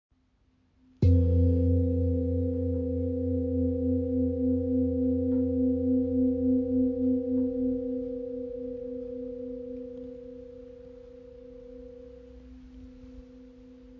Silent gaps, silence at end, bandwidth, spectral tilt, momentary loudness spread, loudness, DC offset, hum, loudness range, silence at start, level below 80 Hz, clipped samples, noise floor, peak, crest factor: none; 0 s; 4 kHz; -12.5 dB/octave; 23 LU; -28 LUFS; under 0.1%; none; 19 LU; 1 s; -38 dBFS; under 0.1%; -67 dBFS; -14 dBFS; 16 dB